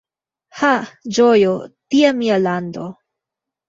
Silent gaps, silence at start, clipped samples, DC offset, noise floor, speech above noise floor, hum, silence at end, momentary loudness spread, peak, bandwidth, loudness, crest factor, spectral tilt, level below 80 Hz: none; 0.55 s; under 0.1%; under 0.1%; -84 dBFS; 69 dB; none; 0.75 s; 14 LU; -2 dBFS; 7.8 kHz; -16 LUFS; 16 dB; -5 dB/octave; -62 dBFS